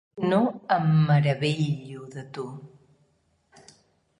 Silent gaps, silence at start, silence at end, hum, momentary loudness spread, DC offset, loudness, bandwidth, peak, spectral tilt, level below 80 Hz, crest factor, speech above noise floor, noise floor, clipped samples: none; 0.15 s; 1.5 s; none; 18 LU; under 0.1%; -24 LUFS; 10 kHz; -8 dBFS; -7.5 dB/octave; -62 dBFS; 18 dB; 44 dB; -68 dBFS; under 0.1%